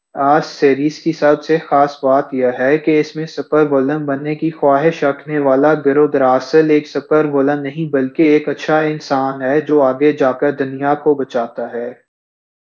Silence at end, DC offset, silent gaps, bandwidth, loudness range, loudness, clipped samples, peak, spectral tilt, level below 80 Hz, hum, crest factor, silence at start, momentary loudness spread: 0.75 s; under 0.1%; none; 7.2 kHz; 2 LU; -15 LUFS; under 0.1%; 0 dBFS; -7 dB/octave; -66 dBFS; none; 14 dB; 0.15 s; 7 LU